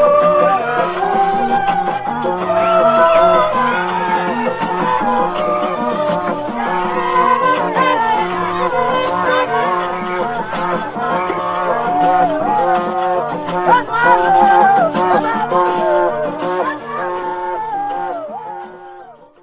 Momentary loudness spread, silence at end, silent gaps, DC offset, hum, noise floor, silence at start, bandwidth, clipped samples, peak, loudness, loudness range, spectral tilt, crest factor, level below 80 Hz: 10 LU; 0.3 s; none; under 0.1%; none; -38 dBFS; 0 s; 4 kHz; under 0.1%; 0 dBFS; -15 LUFS; 4 LU; -9 dB/octave; 16 dB; -50 dBFS